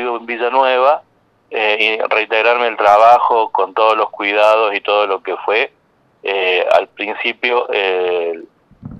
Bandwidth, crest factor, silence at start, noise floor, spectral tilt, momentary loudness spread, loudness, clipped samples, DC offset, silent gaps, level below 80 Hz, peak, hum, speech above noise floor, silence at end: 9.8 kHz; 14 dB; 0 s; -35 dBFS; -3.5 dB/octave; 9 LU; -14 LUFS; under 0.1%; under 0.1%; none; -60 dBFS; 0 dBFS; none; 21 dB; 0 s